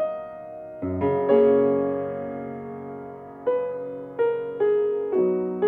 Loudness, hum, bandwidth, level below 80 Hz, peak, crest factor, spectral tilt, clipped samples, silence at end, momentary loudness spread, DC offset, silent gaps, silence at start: -24 LUFS; none; 3.6 kHz; -64 dBFS; -6 dBFS; 18 dB; -10.5 dB/octave; under 0.1%; 0 s; 18 LU; under 0.1%; none; 0 s